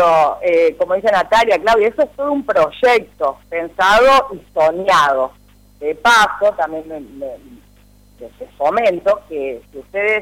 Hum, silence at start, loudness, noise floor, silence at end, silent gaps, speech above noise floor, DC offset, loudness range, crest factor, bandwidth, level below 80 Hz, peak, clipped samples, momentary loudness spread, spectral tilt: 50 Hz at -50 dBFS; 0 s; -15 LUFS; -48 dBFS; 0 s; none; 32 dB; under 0.1%; 6 LU; 10 dB; 16.5 kHz; -46 dBFS; -6 dBFS; under 0.1%; 15 LU; -3 dB/octave